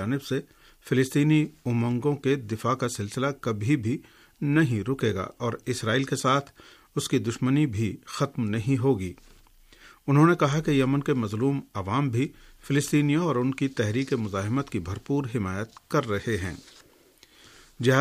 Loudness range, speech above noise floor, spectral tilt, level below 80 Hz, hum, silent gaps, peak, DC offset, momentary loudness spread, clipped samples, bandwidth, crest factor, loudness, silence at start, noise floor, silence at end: 3 LU; 32 dB; -6.5 dB/octave; -58 dBFS; none; none; -6 dBFS; under 0.1%; 9 LU; under 0.1%; 15 kHz; 20 dB; -26 LUFS; 0 s; -57 dBFS; 0 s